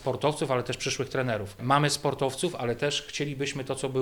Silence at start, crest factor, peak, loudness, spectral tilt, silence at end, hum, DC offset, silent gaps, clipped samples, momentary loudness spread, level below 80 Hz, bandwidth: 0 s; 20 dB; -8 dBFS; -28 LUFS; -4.5 dB/octave; 0 s; none; under 0.1%; none; under 0.1%; 7 LU; -56 dBFS; 19.5 kHz